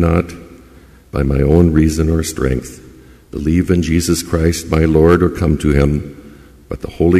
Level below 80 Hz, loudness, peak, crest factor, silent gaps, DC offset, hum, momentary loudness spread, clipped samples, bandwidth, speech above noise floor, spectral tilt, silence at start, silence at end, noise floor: -24 dBFS; -15 LUFS; 0 dBFS; 14 dB; none; under 0.1%; none; 17 LU; under 0.1%; 15 kHz; 29 dB; -6.5 dB/octave; 0 s; 0 s; -42 dBFS